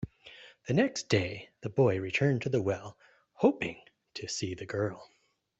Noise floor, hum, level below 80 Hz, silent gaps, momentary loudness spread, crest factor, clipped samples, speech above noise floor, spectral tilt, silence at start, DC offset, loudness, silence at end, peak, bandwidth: -54 dBFS; none; -64 dBFS; none; 19 LU; 20 dB; under 0.1%; 24 dB; -5.5 dB/octave; 0 s; under 0.1%; -31 LUFS; 0.55 s; -12 dBFS; 8.2 kHz